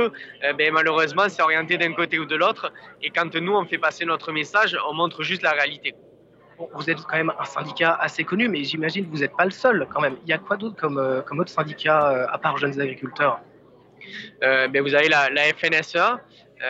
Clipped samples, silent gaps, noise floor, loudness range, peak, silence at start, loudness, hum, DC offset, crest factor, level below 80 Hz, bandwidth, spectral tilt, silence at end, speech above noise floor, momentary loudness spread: under 0.1%; none; -52 dBFS; 3 LU; -6 dBFS; 0 s; -22 LUFS; none; under 0.1%; 18 dB; -70 dBFS; 8 kHz; -4.5 dB/octave; 0 s; 30 dB; 9 LU